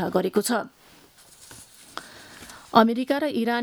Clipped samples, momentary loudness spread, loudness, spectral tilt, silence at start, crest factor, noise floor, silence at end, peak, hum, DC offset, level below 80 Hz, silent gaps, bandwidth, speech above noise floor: under 0.1%; 25 LU; -23 LUFS; -4.5 dB/octave; 0 s; 24 dB; -53 dBFS; 0 s; -2 dBFS; none; under 0.1%; -64 dBFS; none; over 20 kHz; 31 dB